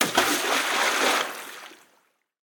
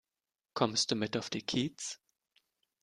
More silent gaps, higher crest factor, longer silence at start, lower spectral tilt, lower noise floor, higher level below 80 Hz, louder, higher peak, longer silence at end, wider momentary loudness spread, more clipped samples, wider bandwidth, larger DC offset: neither; about the same, 22 dB vs 24 dB; second, 0 s vs 0.55 s; second, -0.5 dB/octave vs -3.5 dB/octave; second, -67 dBFS vs under -90 dBFS; about the same, -68 dBFS vs -72 dBFS; first, -22 LUFS vs -34 LUFS; first, -4 dBFS vs -14 dBFS; second, 0.7 s vs 0.9 s; first, 17 LU vs 13 LU; neither; first, 19 kHz vs 12 kHz; neither